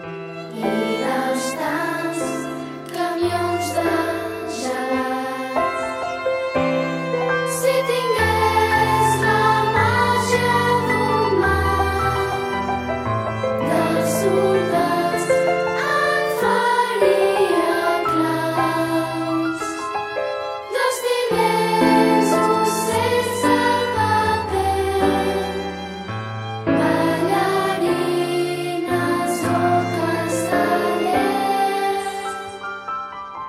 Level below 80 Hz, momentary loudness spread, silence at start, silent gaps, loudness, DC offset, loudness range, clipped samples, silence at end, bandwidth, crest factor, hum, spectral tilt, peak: -44 dBFS; 9 LU; 0 s; none; -20 LUFS; under 0.1%; 5 LU; under 0.1%; 0 s; 16 kHz; 16 dB; none; -5 dB/octave; -4 dBFS